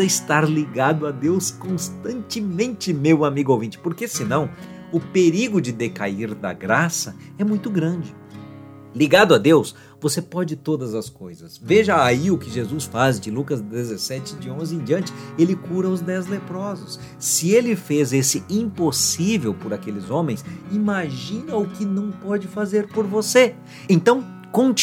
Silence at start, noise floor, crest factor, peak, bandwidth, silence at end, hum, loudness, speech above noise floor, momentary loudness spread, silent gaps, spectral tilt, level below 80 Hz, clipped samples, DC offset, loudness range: 0 s; -40 dBFS; 20 dB; 0 dBFS; 17 kHz; 0 s; none; -21 LUFS; 19 dB; 13 LU; none; -4.5 dB/octave; -62 dBFS; under 0.1%; under 0.1%; 5 LU